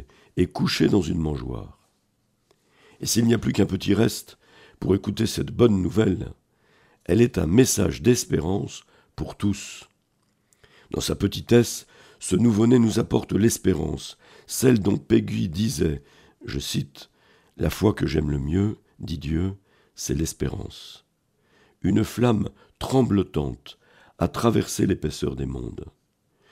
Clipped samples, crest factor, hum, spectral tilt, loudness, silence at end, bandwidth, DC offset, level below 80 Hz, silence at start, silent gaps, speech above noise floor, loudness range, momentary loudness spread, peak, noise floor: under 0.1%; 20 dB; none; -5.5 dB/octave; -23 LUFS; 0.65 s; 16 kHz; under 0.1%; -44 dBFS; 0 s; none; 47 dB; 5 LU; 16 LU; -4 dBFS; -69 dBFS